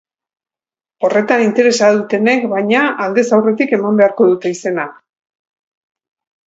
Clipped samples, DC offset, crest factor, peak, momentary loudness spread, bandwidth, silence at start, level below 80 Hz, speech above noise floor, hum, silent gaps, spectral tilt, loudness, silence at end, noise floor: under 0.1%; under 0.1%; 14 dB; 0 dBFS; 8 LU; 8 kHz; 1 s; -66 dBFS; over 77 dB; none; none; -5 dB/octave; -13 LUFS; 1.55 s; under -90 dBFS